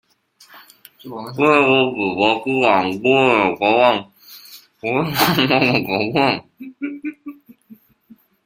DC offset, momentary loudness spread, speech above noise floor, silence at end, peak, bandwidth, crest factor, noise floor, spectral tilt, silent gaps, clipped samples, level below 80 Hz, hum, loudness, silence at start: under 0.1%; 17 LU; 35 dB; 0.7 s; 0 dBFS; 16.5 kHz; 18 dB; -52 dBFS; -5 dB/octave; none; under 0.1%; -58 dBFS; none; -16 LUFS; 0.55 s